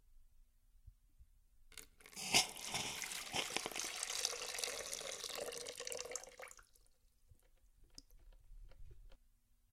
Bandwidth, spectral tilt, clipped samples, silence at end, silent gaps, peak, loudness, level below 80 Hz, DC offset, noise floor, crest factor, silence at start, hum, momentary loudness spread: 16.5 kHz; 0 dB/octave; under 0.1%; 0.55 s; none; -14 dBFS; -40 LUFS; -66 dBFS; under 0.1%; -72 dBFS; 32 dB; 0.1 s; none; 24 LU